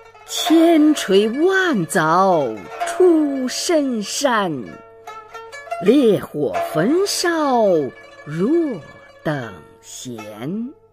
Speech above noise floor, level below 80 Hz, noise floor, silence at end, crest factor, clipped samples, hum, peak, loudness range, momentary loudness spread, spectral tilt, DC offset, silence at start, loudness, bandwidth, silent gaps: 21 dB; -60 dBFS; -38 dBFS; 0.2 s; 16 dB; under 0.1%; none; -2 dBFS; 5 LU; 20 LU; -4.5 dB/octave; under 0.1%; 0.25 s; -18 LUFS; 15.5 kHz; none